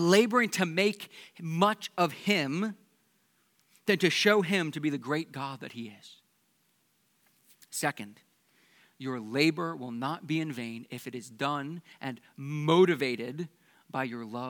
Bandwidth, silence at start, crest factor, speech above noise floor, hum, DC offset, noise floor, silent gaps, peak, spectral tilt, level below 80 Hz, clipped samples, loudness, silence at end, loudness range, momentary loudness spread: 19 kHz; 0 s; 24 dB; 42 dB; none; under 0.1%; -72 dBFS; none; -8 dBFS; -5 dB/octave; -88 dBFS; under 0.1%; -29 LUFS; 0 s; 10 LU; 18 LU